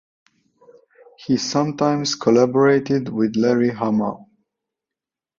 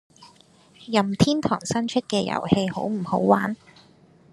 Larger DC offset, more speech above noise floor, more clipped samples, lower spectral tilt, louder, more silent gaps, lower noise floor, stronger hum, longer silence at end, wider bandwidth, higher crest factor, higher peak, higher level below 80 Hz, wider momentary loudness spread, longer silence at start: neither; first, 70 dB vs 32 dB; neither; about the same, -5.5 dB/octave vs -5.5 dB/octave; first, -19 LUFS vs -23 LUFS; neither; first, -88 dBFS vs -54 dBFS; neither; first, 1.15 s vs 0.75 s; second, 7.6 kHz vs 12 kHz; about the same, 18 dB vs 22 dB; about the same, -2 dBFS vs -2 dBFS; second, -62 dBFS vs -56 dBFS; about the same, 7 LU vs 6 LU; first, 1.2 s vs 0.2 s